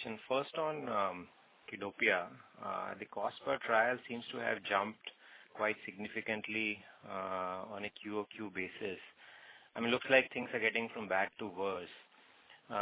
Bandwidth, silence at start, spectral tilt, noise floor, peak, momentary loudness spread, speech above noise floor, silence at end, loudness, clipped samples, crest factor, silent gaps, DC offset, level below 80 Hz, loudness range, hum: 4 kHz; 0 s; -1.5 dB/octave; -63 dBFS; -14 dBFS; 18 LU; 25 dB; 0 s; -37 LUFS; under 0.1%; 24 dB; none; under 0.1%; -76 dBFS; 5 LU; none